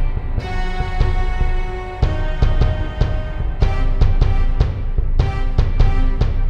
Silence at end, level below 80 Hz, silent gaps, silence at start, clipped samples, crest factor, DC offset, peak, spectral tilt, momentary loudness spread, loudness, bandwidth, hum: 0 s; -16 dBFS; none; 0 s; under 0.1%; 16 dB; under 0.1%; 0 dBFS; -7.5 dB/octave; 6 LU; -21 LUFS; 6.2 kHz; none